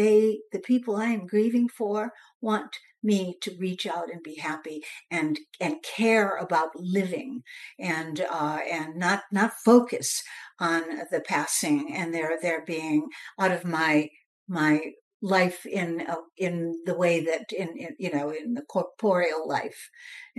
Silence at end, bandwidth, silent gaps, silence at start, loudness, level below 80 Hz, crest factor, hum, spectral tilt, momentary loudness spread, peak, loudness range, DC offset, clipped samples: 0.15 s; 12.5 kHz; 2.35-2.40 s, 14.26-14.46 s, 15.01-15.20 s; 0 s; -27 LUFS; -80 dBFS; 22 dB; none; -4.5 dB/octave; 11 LU; -6 dBFS; 4 LU; under 0.1%; under 0.1%